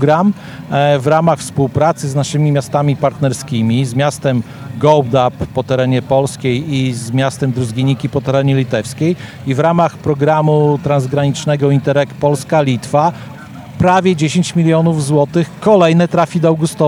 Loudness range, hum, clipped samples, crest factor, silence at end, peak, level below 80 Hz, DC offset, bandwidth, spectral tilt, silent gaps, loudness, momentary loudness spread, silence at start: 2 LU; none; under 0.1%; 14 dB; 0 s; 0 dBFS; -48 dBFS; under 0.1%; 13 kHz; -6.5 dB/octave; none; -14 LUFS; 6 LU; 0 s